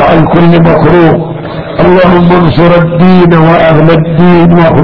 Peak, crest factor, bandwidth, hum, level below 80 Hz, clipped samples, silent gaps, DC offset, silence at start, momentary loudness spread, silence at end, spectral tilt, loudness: 0 dBFS; 4 dB; 5.4 kHz; none; -26 dBFS; 8%; none; 7%; 0 s; 5 LU; 0 s; -10 dB/octave; -4 LUFS